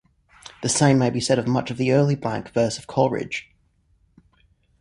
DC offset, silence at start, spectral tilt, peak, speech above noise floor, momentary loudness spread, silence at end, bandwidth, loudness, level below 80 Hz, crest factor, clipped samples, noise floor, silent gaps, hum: under 0.1%; 0.45 s; -5 dB/octave; -4 dBFS; 42 dB; 10 LU; 1.4 s; 11.5 kHz; -22 LUFS; -54 dBFS; 20 dB; under 0.1%; -63 dBFS; none; none